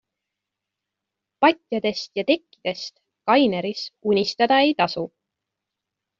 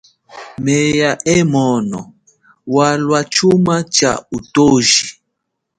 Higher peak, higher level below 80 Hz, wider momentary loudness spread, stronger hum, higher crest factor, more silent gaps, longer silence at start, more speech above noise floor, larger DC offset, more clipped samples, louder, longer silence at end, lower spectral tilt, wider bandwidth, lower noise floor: second, -4 dBFS vs 0 dBFS; second, -68 dBFS vs -48 dBFS; about the same, 13 LU vs 11 LU; neither; about the same, 20 dB vs 16 dB; neither; first, 1.4 s vs 0.35 s; about the same, 63 dB vs 61 dB; neither; neither; second, -22 LUFS vs -14 LUFS; first, 1.15 s vs 0.65 s; about the same, -5 dB/octave vs -4 dB/octave; second, 7.4 kHz vs 11 kHz; first, -84 dBFS vs -74 dBFS